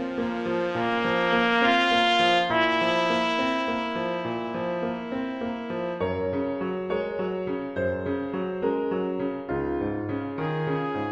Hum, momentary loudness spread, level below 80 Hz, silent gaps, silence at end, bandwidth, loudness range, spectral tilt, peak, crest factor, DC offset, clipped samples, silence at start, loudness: none; 10 LU; -56 dBFS; none; 0 s; 10 kHz; 7 LU; -5.5 dB/octave; -6 dBFS; 20 dB; under 0.1%; under 0.1%; 0 s; -26 LUFS